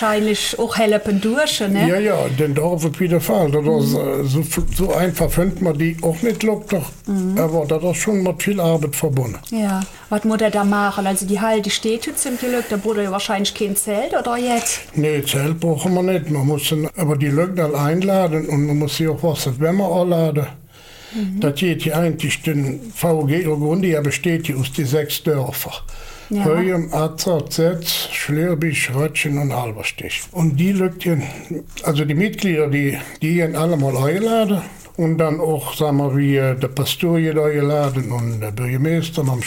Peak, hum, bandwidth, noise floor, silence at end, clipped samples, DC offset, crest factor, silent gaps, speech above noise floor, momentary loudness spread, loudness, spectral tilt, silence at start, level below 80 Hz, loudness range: -4 dBFS; none; 17 kHz; -41 dBFS; 0 s; under 0.1%; under 0.1%; 14 dB; none; 23 dB; 6 LU; -19 LUFS; -5.5 dB/octave; 0 s; -38 dBFS; 2 LU